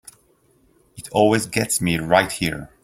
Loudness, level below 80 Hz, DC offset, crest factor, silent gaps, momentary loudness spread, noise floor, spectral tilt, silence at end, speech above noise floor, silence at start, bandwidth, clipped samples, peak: -20 LUFS; -50 dBFS; under 0.1%; 20 dB; none; 8 LU; -59 dBFS; -4 dB/octave; 0.2 s; 40 dB; 0.95 s; 16.5 kHz; under 0.1%; -2 dBFS